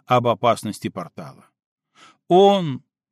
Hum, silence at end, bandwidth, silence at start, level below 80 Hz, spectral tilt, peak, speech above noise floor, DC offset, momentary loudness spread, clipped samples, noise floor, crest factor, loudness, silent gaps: none; 0.35 s; 13.5 kHz; 0.1 s; -68 dBFS; -6 dB/octave; -4 dBFS; 35 dB; under 0.1%; 20 LU; under 0.1%; -53 dBFS; 18 dB; -19 LUFS; 1.66-1.76 s